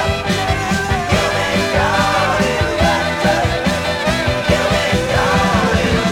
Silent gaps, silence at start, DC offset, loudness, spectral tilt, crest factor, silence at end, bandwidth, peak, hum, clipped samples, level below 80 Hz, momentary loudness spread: none; 0 s; under 0.1%; -15 LUFS; -4.5 dB/octave; 14 dB; 0 s; 17 kHz; -2 dBFS; none; under 0.1%; -28 dBFS; 3 LU